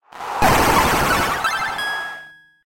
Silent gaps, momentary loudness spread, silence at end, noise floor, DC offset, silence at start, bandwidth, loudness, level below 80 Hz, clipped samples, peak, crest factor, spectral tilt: none; 14 LU; 0.35 s; -41 dBFS; under 0.1%; 0.15 s; 16.5 kHz; -18 LUFS; -34 dBFS; under 0.1%; -4 dBFS; 16 dB; -3.5 dB/octave